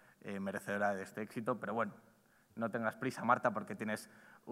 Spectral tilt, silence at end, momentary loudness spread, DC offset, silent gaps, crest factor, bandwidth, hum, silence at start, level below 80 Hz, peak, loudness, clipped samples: -6 dB/octave; 0 s; 11 LU; under 0.1%; none; 24 dB; 16 kHz; none; 0.25 s; -86 dBFS; -16 dBFS; -38 LUFS; under 0.1%